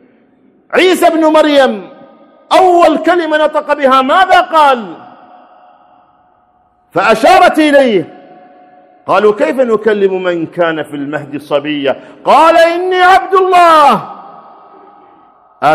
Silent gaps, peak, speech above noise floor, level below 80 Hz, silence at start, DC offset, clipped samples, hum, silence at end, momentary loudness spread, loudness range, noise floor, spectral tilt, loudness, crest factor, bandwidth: none; 0 dBFS; 43 dB; -50 dBFS; 0.7 s; under 0.1%; 1%; none; 0 s; 12 LU; 4 LU; -52 dBFS; -4.5 dB/octave; -9 LUFS; 10 dB; 14.5 kHz